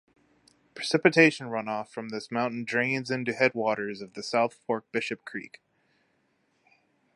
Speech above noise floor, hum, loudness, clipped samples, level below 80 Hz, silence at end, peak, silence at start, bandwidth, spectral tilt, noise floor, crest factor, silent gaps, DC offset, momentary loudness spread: 44 dB; none; -27 LUFS; under 0.1%; -78 dBFS; 1.7 s; -4 dBFS; 0.75 s; 11.5 kHz; -5 dB/octave; -71 dBFS; 26 dB; none; under 0.1%; 15 LU